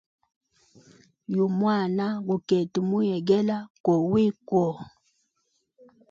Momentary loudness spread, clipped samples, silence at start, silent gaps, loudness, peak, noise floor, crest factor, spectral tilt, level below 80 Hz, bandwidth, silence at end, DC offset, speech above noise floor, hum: 7 LU; under 0.1%; 1.3 s; 3.70-3.84 s; -25 LUFS; -8 dBFS; -74 dBFS; 18 dB; -8 dB/octave; -66 dBFS; 7.4 kHz; 1.2 s; under 0.1%; 50 dB; none